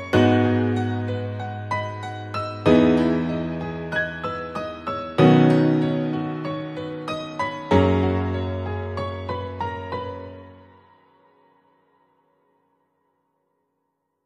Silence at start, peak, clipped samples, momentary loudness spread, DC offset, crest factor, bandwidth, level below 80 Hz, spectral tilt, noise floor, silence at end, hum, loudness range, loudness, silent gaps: 0 s; -2 dBFS; under 0.1%; 14 LU; under 0.1%; 20 dB; 9.8 kHz; -50 dBFS; -8 dB/octave; -75 dBFS; 3.65 s; none; 13 LU; -23 LUFS; none